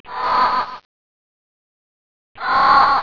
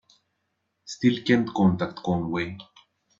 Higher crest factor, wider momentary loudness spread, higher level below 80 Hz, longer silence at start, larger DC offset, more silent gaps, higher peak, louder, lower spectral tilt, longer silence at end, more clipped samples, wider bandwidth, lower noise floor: about the same, 16 dB vs 20 dB; about the same, 14 LU vs 14 LU; first, -50 dBFS vs -60 dBFS; second, 0.05 s vs 0.85 s; neither; first, 0.85-2.35 s vs none; first, -2 dBFS vs -6 dBFS; first, -16 LUFS vs -25 LUFS; second, -4 dB/octave vs -6.5 dB/octave; second, 0 s vs 0.55 s; neither; second, 5.4 kHz vs 7.6 kHz; first, under -90 dBFS vs -77 dBFS